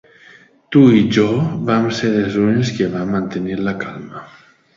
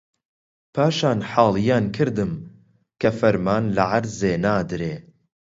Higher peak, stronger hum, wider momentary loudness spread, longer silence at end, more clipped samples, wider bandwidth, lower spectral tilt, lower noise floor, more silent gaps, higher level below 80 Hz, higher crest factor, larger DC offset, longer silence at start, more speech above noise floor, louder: about the same, 0 dBFS vs -2 dBFS; neither; first, 16 LU vs 10 LU; about the same, 0.5 s vs 0.4 s; neither; about the same, 7.6 kHz vs 7.8 kHz; about the same, -7 dB/octave vs -6.5 dB/octave; second, -46 dBFS vs -54 dBFS; neither; about the same, -50 dBFS vs -50 dBFS; about the same, 16 dB vs 20 dB; neither; about the same, 0.7 s vs 0.75 s; about the same, 31 dB vs 34 dB; first, -16 LUFS vs -21 LUFS